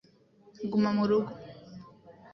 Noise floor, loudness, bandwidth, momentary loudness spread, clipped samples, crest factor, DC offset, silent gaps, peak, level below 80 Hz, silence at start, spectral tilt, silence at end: -60 dBFS; -29 LUFS; 6.2 kHz; 23 LU; under 0.1%; 16 dB; under 0.1%; none; -16 dBFS; -68 dBFS; 0.6 s; -8 dB/octave; 0.2 s